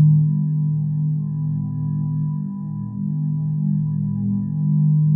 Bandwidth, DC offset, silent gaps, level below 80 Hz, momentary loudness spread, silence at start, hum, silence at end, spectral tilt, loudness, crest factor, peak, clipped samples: 1.1 kHz; under 0.1%; none; -56 dBFS; 8 LU; 0 s; none; 0 s; -15.5 dB/octave; -22 LUFS; 14 dB; -6 dBFS; under 0.1%